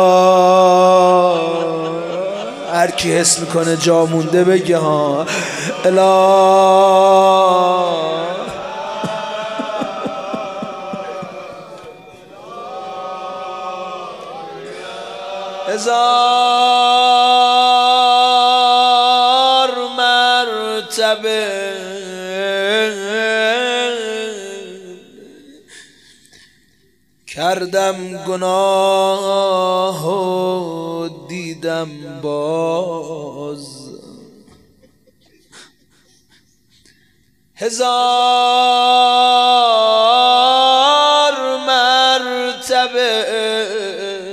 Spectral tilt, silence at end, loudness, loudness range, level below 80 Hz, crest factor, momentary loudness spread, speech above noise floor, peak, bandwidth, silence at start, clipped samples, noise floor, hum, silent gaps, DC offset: -3 dB/octave; 0 s; -14 LUFS; 16 LU; -62 dBFS; 16 dB; 17 LU; 44 dB; 0 dBFS; 15 kHz; 0 s; under 0.1%; -58 dBFS; none; none; under 0.1%